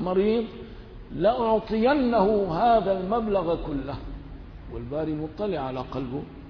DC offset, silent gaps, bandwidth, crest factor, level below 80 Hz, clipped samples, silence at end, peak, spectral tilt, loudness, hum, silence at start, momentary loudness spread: under 0.1%; none; 5.4 kHz; 16 dB; -42 dBFS; under 0.1%; 0 s; -10 dBFS; -9 dB/octave; -25 LUFS; none; 0 s; 19 LU